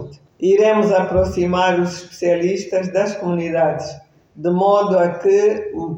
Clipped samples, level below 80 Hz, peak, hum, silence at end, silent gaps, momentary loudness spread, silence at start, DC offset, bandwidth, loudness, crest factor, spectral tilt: under 0.1%; -44 dBFS; -4 dBFS; none; 0 s; none; 9 LU; 0 s; under 0.1%; 8.2 kHz; -17 LUFS; 14 dB; -6.5 dB/octave